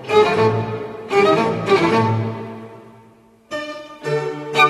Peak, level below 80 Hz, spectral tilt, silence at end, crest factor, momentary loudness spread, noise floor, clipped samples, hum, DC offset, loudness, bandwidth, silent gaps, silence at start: -2 dBFS; -56 dBFS; -6 dB/octave; 0 s; 18 dB; 16 LU; -49 dBFS; under 0.1%; none; under 0.1%; -18 LUFS; 13 kHz; none; 0 s